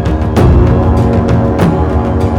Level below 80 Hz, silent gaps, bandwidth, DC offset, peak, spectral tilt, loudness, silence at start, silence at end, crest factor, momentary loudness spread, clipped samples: -16 dBFS; none; 12 kHz; under 0.1%; 0 dBFS; -9 dB/octave; -10 LUFS; 0 s; 0 s; 8 dB; 4 LU; under 0.1%